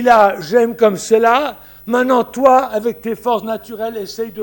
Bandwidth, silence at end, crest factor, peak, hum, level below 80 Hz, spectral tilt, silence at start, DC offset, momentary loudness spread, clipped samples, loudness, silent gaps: 17 kHz; 0 s; 14 dB; 0 dBFS; none; -52 dBFS; -4.5 dB/octave; 0 s; under 0.1%; 12 LU; under 0.1%; -15 LUFS; none